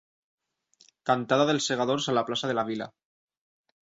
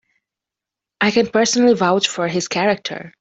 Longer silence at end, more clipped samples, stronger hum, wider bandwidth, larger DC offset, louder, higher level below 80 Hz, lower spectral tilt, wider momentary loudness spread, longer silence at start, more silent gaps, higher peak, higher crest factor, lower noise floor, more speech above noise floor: first, 0.9 s vs 0.1 s; neither; neither; about the same, 8 kHz vs 8.2 kHz; neither; second, -27 LUFS vs -17 LUFS; second, -70 dBFS vs -60 dBFS; about the same, -4 dB/octave vs -3.5 dB/octave; first, 12 LU vs 7 LU; about the same, 1.05 s vs 1 s; neither; second, -10 dBFS vs -2 dBFS; about the same, 20 dB vs 16 dB; second, -64 dBFS vs -86 dBFS; second, 38 dB vs 69 dB